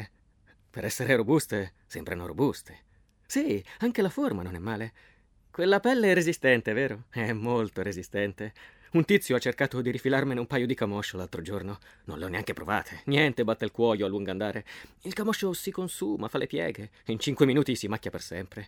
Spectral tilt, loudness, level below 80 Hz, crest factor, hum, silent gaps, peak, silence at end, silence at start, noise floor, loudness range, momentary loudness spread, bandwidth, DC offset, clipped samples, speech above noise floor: -5.5 dB/octave; -28 LUFS; -60 dBFS; 22 dB; none; none; -6 dBFS; 0 s; 0 s; -62 dBFS; 5 LU; 14 LU; 19 kHz; under 0.1%; under 0.1%; 34 dB